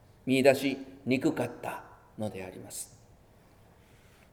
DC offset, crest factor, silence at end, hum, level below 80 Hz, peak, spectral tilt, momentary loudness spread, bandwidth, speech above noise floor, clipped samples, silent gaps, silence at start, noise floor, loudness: under 0.1%; 24 dB; 1.45 s; none; -64 dBFS; -8 dBFS; -5 dB/octave; 19 LU; 18 kHz; 29 dB; under 0.1%; none; 0.25 s; -59 dBFS; -30 LUFS